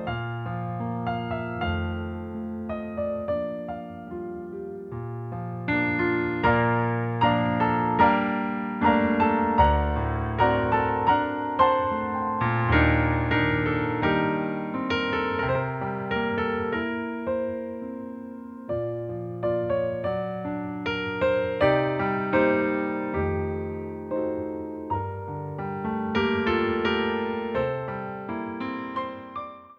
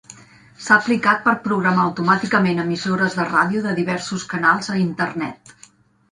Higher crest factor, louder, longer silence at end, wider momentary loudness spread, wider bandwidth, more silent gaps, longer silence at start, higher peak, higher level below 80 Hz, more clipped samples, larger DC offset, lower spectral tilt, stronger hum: about the same, 20 dB vs 20 dB; second, -26 LUFS vs -19 LUFS; second, 0.05 s vs 0.75 s; first, 13 LU vs 8 LU; second, 6.6 kHz vs 11 kHz; neither; about the same, 0 s vs 0.1 s; second, -6 dBFS vs 0 dBFS; first, -42 dBFS vs -60 dBFS; neither; neither; first, -8.5 dB/octave vs -5.5 dB/octave; neither